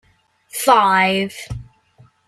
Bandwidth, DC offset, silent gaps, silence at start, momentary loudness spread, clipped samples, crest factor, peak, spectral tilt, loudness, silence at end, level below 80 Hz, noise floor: 15.5 kHz; under 0.1%; none; 0.55 s; 20 LU; under 0.1%; 18 dB; -2 dBFS; -3.5 dB/octave; -16 LUFS; 0.65 s; -48 dBFS; -57 dBFS